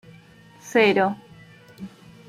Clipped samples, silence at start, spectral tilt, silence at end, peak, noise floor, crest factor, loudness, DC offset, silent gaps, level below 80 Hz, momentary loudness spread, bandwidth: under 0.1%; 0.65 s; -5 dB/octave; 0.4 s; -4 dBFS; -50 dBFS; 20 dB; -20 LUFS; under 0.1%; none; -66 dBFS; 23 LU; 15 kHz